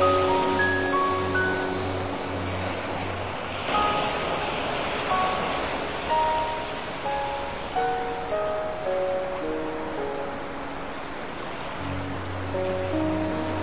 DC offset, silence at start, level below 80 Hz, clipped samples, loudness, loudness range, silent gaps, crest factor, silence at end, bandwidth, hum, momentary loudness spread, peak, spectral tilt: 0.7%; 0 s; -46 dBFS; under 0.1%; -27 LUFS; 5 LU; none; 16 dB; 0 s; 4 kHz; none; 9 LU; -10 dBFS; -3.5 dB/octave